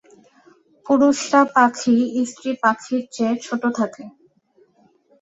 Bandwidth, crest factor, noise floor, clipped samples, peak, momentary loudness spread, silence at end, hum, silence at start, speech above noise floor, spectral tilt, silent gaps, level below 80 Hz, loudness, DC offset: 8.2 kHz; 18 dB; -59 dBFS; under 0.1%; -2 dBFS; 9 LU; 1.1 s; none; 0.85 s; 40 dB; -4 dB/octave; none; -68 dBFS; -19 LUFS; under 0.1%